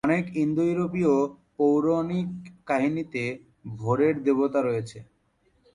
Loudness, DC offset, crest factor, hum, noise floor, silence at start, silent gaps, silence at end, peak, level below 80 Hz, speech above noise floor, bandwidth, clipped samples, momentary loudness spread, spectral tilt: -25 LUFS; under 0.1%; 16 dB; none; -67 dBFS; 0.05 s; none; 0.7 s; -10 dBFS; -62 dBFS; 42 dB; 10.5 kHz; under 0.1%; 11 LU; -8 dB/octave